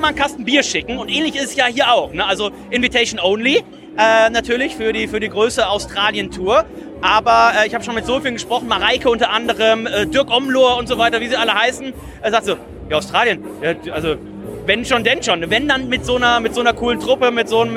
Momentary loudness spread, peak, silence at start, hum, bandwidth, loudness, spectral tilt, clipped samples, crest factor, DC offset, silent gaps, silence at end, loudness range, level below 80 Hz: 8 LU; -2 dBFS; 0 s; none; 15 kHz; -16 LUFS; -3 dB/octave; under 0.1%; 16 dB; under 0.1%; none; 0 s; 3 LU; -42 dBFS